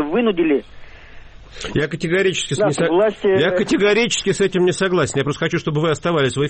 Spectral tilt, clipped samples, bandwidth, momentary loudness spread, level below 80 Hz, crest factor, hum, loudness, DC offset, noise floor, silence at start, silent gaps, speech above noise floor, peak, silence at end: -5 dB/octave; under 0.1%; 8.8 kHz; 5 LU; -44 dBFS; 12 dB; none; -18 LUFS; under 0.1%; -38 dBFS; 0 s; none; 21 dB; -6 dBFS; 0 s